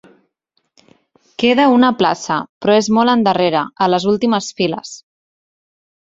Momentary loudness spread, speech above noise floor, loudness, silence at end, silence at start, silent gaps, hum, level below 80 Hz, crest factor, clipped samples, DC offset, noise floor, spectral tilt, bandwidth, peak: 10 LU; 54 dB; -15 LUFS; 1.05 s; 1.4 s; 2.49-2.61 s; none; -58 dBFS; 16 dB; under 0.1%; under 0.1%; -68 dBFS; -5 dB/octave; 7.8 kHz; -2 dBFS